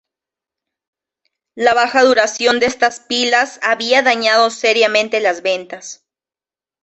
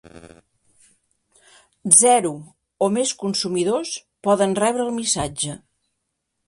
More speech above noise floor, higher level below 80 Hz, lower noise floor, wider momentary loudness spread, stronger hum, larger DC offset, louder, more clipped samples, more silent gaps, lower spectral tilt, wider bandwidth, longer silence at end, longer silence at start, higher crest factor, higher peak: first, over 75 dB vs 57 dB; about the same, -60 dBFS vs -56 dBFS; first, under -90 dBFS vs -77 dBFS; second, 8 LU vs 16 LU; neither; neither; first, -14 LUFS vs -19 LUFS; neither; neither; second, -1.5 dB/octave vs -3 dB/octave; second, 8.4 kHz vs 16 kHz; about the same, 0.9 s vs 0.9 s; first, 1.55 s vs 0.15 s; second, 16 dB vs 22 dB; about the same, -2 dBFS vs 0 dBFS